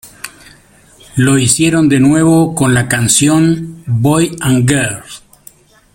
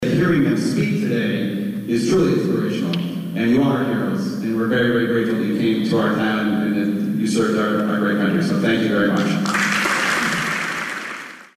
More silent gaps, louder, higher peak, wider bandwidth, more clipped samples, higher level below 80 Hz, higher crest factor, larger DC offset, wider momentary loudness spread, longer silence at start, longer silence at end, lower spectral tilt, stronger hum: neither; first, -11 LUFS vs -19 LUFS; first, 0 dBFS vs -8 dBFS; about the same, 17 kHz vs 15.5 kHz; neither; first, -42 dBFS vs -52 dBFS; about the same, 12 dB vs 12 dB; neither; first, 18 LU vs 5 LU; about the same, 0.05 s vs 0 s; first, 0.75 s vs 0.1 s; about the same, -4.5 dB/octave vs -5.5 dB/octave; neither